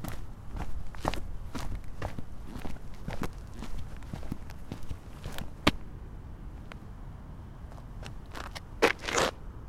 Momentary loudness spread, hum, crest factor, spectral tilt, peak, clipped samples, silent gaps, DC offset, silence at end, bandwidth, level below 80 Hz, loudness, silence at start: 18 LU; none; 30 dB; -4 dB/octave; -6 dBFS; under 0.1%; none; under 0.1%; 0 s; 16.5 kHz; -42 dBFS; -36 LUFS; 0 s